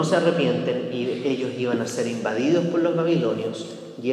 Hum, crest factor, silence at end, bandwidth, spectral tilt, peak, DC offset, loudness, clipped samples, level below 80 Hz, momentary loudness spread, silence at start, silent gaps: none; 18 dB; 0 s; 12.5 kHz; -6 dB/octave; -6 dBFS; under 0.1%; -23 LUFS; under 0.1%; -74 dBFS; 8 LU; 0 s; none